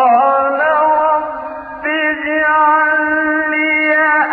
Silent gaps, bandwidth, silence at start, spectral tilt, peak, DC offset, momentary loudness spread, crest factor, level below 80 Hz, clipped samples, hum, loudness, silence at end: none; 4.8 kHz; 0 s; -6.5 dB/octave; 0 dBFS; under 0.1%; 8 LU; 14 dB; -52 dBFS; under 0.1%; none; -13 LUFS; 0 s